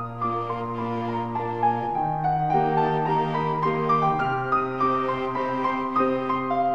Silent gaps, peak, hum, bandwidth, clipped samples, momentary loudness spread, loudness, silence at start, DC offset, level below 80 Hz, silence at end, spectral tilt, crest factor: none; -10 dBFS; none; 7.8 kHz; under 0.1%; 6 LU; -24 LUFS; 0 s; 0.4%; -54 dBFS; 0 s; -8.5 dB/octave; 14 dB